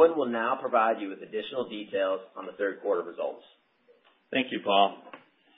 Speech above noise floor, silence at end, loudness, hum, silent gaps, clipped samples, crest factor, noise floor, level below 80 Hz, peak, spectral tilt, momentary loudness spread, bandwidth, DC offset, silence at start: 35 dB; 0.4 s; -29 LUFS; none; none; under 0.1%; 20 dB; -63 dBFS; -82 dBFS; -8 dBFS; -8 dB/octave; 12 LU; 4 kHz; under 0.1%; 0 s